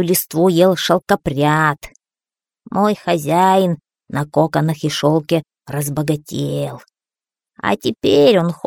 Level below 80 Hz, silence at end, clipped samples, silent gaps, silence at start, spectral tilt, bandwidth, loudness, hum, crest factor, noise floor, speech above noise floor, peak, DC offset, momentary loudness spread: -50 dBFS; 0.1 s; under 0.1%; none; 0 s; -5.5 dB/octave; 18 kHz; -17 LUFS; none; 16 dB; under -90 dBFS; over 74 dB; 0 dBFS; under 0.1%; 11 LU